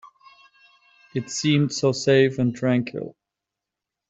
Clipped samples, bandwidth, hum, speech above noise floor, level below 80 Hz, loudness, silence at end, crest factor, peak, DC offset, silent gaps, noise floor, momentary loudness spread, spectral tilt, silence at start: under 0.1%; 8.2 kHz; none; 65 dB; -64 dBFS; -22 LUFS; 1 s; 20 dB; -4 dBFS; under 0.1%; none; -86 dBFS; 14 LU; -5.5 dB/octave; 0.05 s